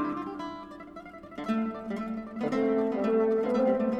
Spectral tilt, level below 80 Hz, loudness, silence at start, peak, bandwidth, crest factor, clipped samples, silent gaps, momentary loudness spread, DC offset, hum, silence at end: -7.5 dB/octave; -62 dBFS; -29 LUFS; 0 s; -14 dBFS; 8.6 kHz; 14 dB; under 0.1%; none; 18 LU; under 0.1%; none; 0 s